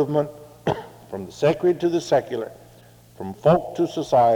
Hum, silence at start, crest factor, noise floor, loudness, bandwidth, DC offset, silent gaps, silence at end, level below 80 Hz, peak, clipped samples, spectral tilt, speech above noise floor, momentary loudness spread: none; 0 s; 18 dB; -49 dBFS; -22 LUFS; 19 kHz; under 0.1%; none; 0 s; -56 dBFS; -4 dBFS; under 0.1%; -7 dB/octave; 29 dB; 16 LU